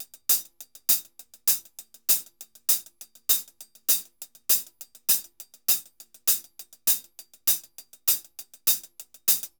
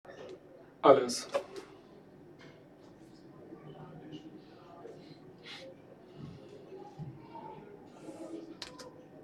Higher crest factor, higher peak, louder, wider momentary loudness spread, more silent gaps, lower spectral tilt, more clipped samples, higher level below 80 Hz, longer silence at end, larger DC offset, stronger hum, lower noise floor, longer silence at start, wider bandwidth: second, 24 dB vs 30 dB; first, -4 dBFS vs -8 dBFS; first, -24 LUFS vs -32 LUFS; second, 16 LU vs 25 LU; neither; second, 2.5 dB/octave vs -4.5 dB/octave; neither; about the same, -74 dBFS vs -74 dBFS; first, 0.15 s vs 0 s; neither; neither; second, -49 dBFS vs -56 dBFS; about the same, 0 s vs 0.05 s; first, over 20 kHz vs 13.5 kHz